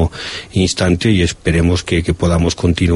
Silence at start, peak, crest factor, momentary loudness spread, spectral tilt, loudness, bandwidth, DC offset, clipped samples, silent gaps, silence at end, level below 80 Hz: 0 s; 0 dBFS; 14 dB; 5 LU; -5.5 dB/octave; -15 LUFS; 11.5 kHz; under 0.1%; under 0.1%; none; 0 s; -28 dBFS